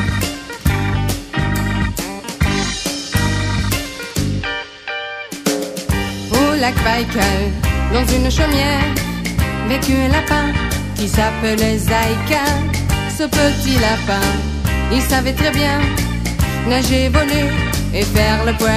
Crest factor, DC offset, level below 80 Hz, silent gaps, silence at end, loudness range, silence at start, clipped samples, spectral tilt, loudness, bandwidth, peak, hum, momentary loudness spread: 16 dB; under 0.1%; -24 dBFS; none; 0 s; 4 LU; 0 s; under 0.1%; -4.5 dB/octave; -17 LUFS; 15.5 kHz; 0 dBFS; none; 6 LU